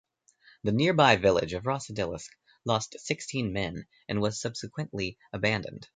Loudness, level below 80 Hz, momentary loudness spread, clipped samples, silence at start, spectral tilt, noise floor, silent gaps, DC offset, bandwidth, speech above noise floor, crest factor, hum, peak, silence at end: -29 LUFS; -54 dBFS; 14 LU; under 0.1%; 0.65 s; -5 dB/octave; -61 dBFS; none; under 0.1%; 9.6 kHz; 33 dB; 24 dB; none; -6 dBFS; 0.1 s